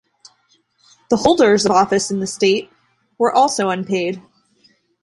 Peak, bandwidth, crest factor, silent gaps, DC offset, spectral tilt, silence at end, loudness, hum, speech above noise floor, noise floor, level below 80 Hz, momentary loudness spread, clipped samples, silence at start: -2 dBFS; 11.5 kHz; 18 dB; none; under 0.1%; -4 dB/octave; 0.85 s; -16 LUFS; none; 45 dB; -61 dBFS; -56 dBFS; 9 LU; under 0.1%; 1.1 s